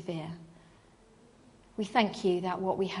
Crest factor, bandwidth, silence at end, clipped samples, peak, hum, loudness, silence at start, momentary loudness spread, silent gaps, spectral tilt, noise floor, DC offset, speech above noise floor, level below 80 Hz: 22 dB; 10.5 kHz; 0 s; under 0.1%; -12 dBFS; none; -31 LUFS; 0 s; 16 LU; none; -6 dB/octave; -60 dBFS; under 0.1%; 29 dB; -66 dBFS